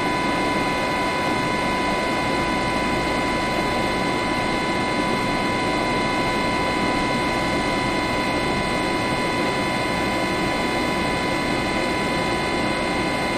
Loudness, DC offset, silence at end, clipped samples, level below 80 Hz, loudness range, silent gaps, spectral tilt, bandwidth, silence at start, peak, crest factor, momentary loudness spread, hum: -22 LUFS; under 0.1%; 0 s; under 0.1%; -40 dBFS; 0 LU; none; -4.5 dB/octave; 15.5 kHz; 0 s; -8 dBFS; 14 dB; 1 LU; none